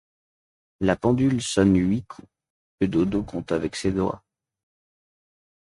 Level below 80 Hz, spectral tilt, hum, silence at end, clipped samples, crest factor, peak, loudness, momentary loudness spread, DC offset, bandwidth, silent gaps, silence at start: -46 dBFS; -6 dB/octave; none; 1.45 s; under 0.1%; 20 dB; -6 dBFS; -24 LUFS; 9 LU; under 0.1%; 11.5 kHz; 2.50-2.78 s; 0.8 s